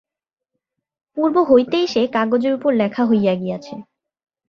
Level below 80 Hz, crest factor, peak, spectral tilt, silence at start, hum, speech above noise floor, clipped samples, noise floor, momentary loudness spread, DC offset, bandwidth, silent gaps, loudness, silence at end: -62 dBFS; 18 dB; -2 dBFS; -6.5 dB/octave; 1.15 s; none; 68 dB; under 0.1%; -85 dBFS; 16 LU; under 0.1%; 7 kHz; none; -17 LUFS; 0.65 s